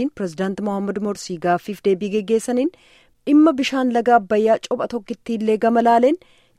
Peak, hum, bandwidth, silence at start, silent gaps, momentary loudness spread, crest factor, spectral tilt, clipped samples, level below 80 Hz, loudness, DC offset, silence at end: -2 dBFS; none; 13.5 kHz; 0 s; none; 11 LU; 16 dB; -6 dB/octave; under 0.1%; -60 dBFS; -19 LUFS; under 0.1%; 0.4 s